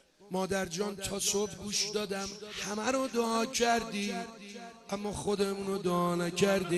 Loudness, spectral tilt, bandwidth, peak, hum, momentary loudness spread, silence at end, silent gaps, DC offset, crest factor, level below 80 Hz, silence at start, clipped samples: -32 LUFS; -3.5 dB/octave; 12.5 kHz; -14 dBFS; none; 10 LU; 0 s; none; under 0.1%; 20 dB; -60 dBFS; 0.2 s; under 0.1%